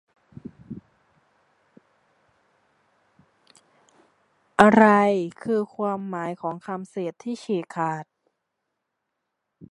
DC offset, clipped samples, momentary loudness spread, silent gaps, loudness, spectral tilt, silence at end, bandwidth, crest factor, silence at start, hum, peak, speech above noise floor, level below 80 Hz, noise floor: under 0.1%; under 0.1%; 26 LU; none; -23 LUFS; -6.5 dB/octave; 0.05 s; 11 kHz; 26 dB; 0.7 s; none; 0 dBFS; 58 dB; -64 dBFS; -80 dBFS